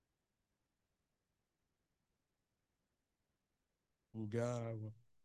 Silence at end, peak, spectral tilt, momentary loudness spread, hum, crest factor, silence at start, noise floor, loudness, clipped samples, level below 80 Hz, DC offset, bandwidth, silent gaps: 0.25 s; -28 dBFS; -7.5 dB/octave; 13 LU; none; 22 dB; 4.15 s; -89 dBFS; -44 LUFS; under 0.1%; -82 dBFS; under 0.1%; 11.5 kHz; none